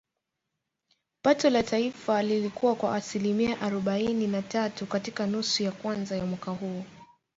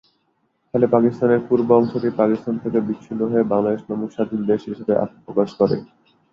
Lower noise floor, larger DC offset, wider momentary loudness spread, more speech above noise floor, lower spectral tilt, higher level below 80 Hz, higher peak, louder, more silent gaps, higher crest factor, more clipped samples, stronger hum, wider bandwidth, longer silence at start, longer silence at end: first, -84 dBFS vs -67 dBFS; neither; about the same, 9 LU vs 8 LU; first, 56 dB vs 48 dB; second, -5 dB/octave vs -9.5 dB/octave; about the same, -64 dBFS vs -60 dBFS; second, -10 dBFS vs -2 dBFS; second, -28 LUFS vs -20 LUFS; neither; about the same, 20 dB vs 18 dB; neither; neither; first, 8 kHz vs 7 kHz; first, 1.25 s vs 0.75 s; about the same, 0.35 s vs 0.45 s